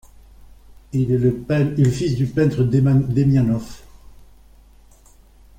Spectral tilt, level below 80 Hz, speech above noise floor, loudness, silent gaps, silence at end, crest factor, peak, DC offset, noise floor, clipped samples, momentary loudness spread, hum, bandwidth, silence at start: -8.5 dB/octave; -44 dBFS; 32 dB; -19 LUFS; none; 1.8 s; 14 dB; -6 dBFS; under 0.1%; -49 dBFS; under 0.1%; 7 LU; none; 9.4 kHz; 0.95 s